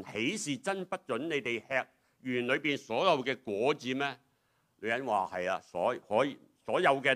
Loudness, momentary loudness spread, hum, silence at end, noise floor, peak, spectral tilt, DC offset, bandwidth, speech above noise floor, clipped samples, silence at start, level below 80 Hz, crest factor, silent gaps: -32 LUFS; 8 LU; none; 0 s; -74 dBFS; -12 dBFS; -4 dB/octave; under 0.1%; 15 kHz; 42 dB; under 0.1%; 0 s; -80 dBFS; 22 dB; none